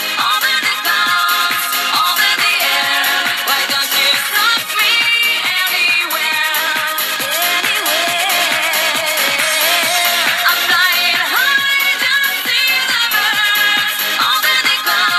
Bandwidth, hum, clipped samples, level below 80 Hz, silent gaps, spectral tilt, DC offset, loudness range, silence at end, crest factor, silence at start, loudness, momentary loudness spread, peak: 15.5 kHz; none; under 0.1%; -66 dBFS; none; 1 dB/octave; under 0.1%; 2 LU; 0 s; 14 dB; 0 s; -12 LUFS; 3 LU; 0 dBFS